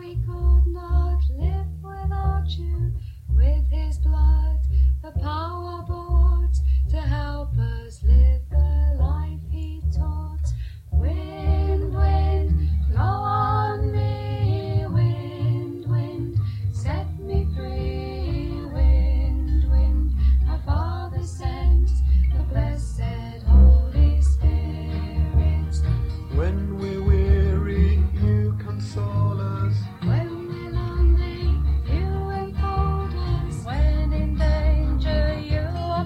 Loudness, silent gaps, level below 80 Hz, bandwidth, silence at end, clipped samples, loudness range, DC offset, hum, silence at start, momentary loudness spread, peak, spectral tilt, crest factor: -23 LUFS; none; -22 dBFS; 5.2 kHz; 0 s; under 0.1%; 4 LU; under 0.1%; none; 0 s; 8 LU; -6 dBFS; -8.5 dB/octave; 16 dB